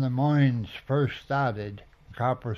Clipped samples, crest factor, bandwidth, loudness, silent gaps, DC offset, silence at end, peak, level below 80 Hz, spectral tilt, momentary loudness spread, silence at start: under 0.1%; 14 dB; 6.2 kHz; -27 LUFS; none; under 0.1%; 0 s; -12 dBFS; -56 dBFS; -9 dB/octave; 14 LU; 0 s